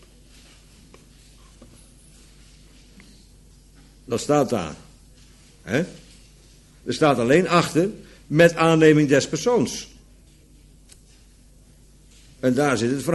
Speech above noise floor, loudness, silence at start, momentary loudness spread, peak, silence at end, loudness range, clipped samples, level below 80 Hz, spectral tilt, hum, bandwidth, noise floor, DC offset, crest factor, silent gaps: 32 dB; -20 LUFS; 4.1 s; 18 LU; -2 dBFS; 0 s; 11 LU; under 0.1%; -52 dBFS; -5.5 dB/octave; none; 12 kHz; -51 dBFS; under 0.1%; 22 dB; none